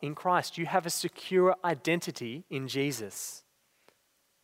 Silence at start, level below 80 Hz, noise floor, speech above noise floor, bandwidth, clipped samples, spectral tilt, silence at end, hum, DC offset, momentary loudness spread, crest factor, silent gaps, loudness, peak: 0 s; -80 dBFS; -72 dBFS; 42 dB; 16 kHz; under 0.1%; -4 dB/octave; 1.05 s; none; under 0.1%; 13 LU; 20 dB; none; -31 LUFS; -12 dBFS